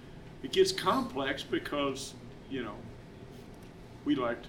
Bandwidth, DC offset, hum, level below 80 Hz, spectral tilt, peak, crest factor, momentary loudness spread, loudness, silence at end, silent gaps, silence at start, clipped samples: 17 kHz; under 0.1%; none; -56 dBFS; -4 dB/octave; -14 dBFS; 20 dB; 22 LU; -32 LUFS; 0 s; none; 0 s; under 0.1%